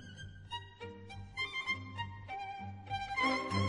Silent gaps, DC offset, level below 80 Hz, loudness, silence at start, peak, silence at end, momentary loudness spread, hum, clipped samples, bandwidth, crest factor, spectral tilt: none; under 0.1%; -62 dBFS; -39 LUFS; 0 s; -20 dBFS; 0 s; 17 LU; none; under 0.1%; 11.5 kHz; 20 dB; -5 dB/octave